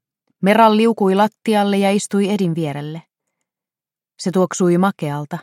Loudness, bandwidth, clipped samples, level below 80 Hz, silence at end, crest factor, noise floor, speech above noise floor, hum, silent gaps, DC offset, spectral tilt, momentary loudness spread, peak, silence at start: -17 LUFS; 15 kHz; under 0.1%; -70 dBFS; 0 s; 16 dB; under -90 dBFS; over 74 dB; none; none; under 0.1%; -6 dB/octave; 12 LU; -2 dBFS; 0.4 s